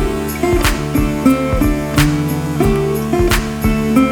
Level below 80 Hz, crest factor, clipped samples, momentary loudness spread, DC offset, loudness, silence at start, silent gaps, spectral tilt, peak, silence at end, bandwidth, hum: -22 dBFS; 14 dB; under 0.1%; 3 LU; under 0.1%; -15 LUFS; 0 s; none; -6 dB/octave; 0 dBFS; 0 s; over 20 kHz; none